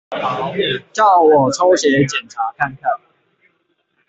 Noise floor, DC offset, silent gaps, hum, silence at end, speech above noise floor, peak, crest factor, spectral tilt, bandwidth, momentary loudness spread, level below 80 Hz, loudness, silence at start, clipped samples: -65 dBFS; under 0.1%; none; none; 1.15 s; 50 dB; 0 dBFS; 16 dB; -4.5 dB/octave; 8.2 kHz; 11 LU; -56 dBFS; -15 LUFS; 0.1 s; under 0.1%